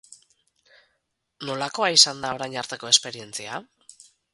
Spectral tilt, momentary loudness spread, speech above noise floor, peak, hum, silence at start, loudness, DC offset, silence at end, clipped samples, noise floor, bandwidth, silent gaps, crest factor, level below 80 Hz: -0.5 dB/octave; 19 LU; 51 dB; -2 dBFS; none; 0.1 s; -21 LUFS; under 0.1%; 0.7 s; under 0.1%; -76 dBFS; 12 kHz; none; 26 dB; -70 dBFS